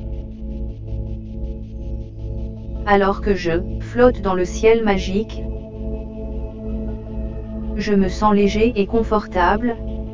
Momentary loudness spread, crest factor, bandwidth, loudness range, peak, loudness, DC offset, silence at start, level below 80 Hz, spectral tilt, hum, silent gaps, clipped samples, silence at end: 15 LU; 20 dB; 7.6 kHz; 6 LU; 0 dBFS; -21 LUFS; under 0.1%; 0 s; -28 dBFS; -6.5 dB/octave; none; none; under 0.1%; 0 s